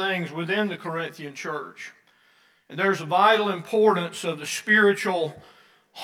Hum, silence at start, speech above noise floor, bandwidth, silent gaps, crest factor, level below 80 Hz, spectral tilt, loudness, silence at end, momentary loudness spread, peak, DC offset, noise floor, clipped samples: none; 0 s; 37 dB; 15.5 kHz; none; 20 dB; -78 dBFS; -4 dB/octave; -23 LUFS; 0 s; 16 LU; -6 dBFS; under 0.1%; -61 dBFS; under 0.1%